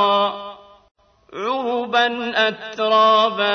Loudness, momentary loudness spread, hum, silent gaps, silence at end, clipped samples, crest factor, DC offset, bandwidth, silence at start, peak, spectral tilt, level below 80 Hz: -18 LUFS; 16 LU; none; 0.91-0.95 s; 0 s; under 0.1%; 16 dB; under 0.1%; 6.6 kHz; 0 s; -4 dBFS; -3.5 dB/octave; -66 dBFS